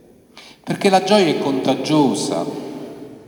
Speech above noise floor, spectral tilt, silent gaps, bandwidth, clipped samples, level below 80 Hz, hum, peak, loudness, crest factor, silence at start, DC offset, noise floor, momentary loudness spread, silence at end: 28 dB; -5 dB/octave; none; over 20 kHz; under 0.1%; -64 dBFS; none; -2 dBFS; -17 LUFS; 18 dB; 0.35 s; under 0.1%; -44 dBFS; 18 LU; 0.05 s